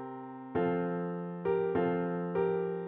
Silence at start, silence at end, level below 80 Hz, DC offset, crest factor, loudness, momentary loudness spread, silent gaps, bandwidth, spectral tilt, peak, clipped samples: 0 s; 0 s; -68 dBFS; under 0.1%; 14 dB; -33 LUFS; 7 LU; none; 4 kHz; -11 dB/octave; -18 dBFS; under 0.1%